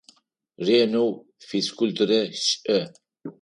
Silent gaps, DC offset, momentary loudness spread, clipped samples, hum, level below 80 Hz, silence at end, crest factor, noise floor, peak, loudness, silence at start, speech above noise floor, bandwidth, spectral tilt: none; under 0.1%; 19 LU; under 0.1%; none; -74 dBFS; 0.1 s; 16 dB; -58 dBFS; -8 dBFS; -23 LUFS; 0.6 s; 35 dB; 11.5 kHz; -4 dB/octave